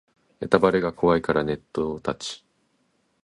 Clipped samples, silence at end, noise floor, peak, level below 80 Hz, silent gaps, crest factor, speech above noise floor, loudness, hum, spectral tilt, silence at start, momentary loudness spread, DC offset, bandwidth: under 0.1%; 0.9 s; -69 dBFS; -2 dBFS; -52 dBFS; none; 22 dB; 46 dB; -24 LUFS; none; -6 dB/octave; 0.4 s; 15 LU; under 0.1%; 11.5 kHz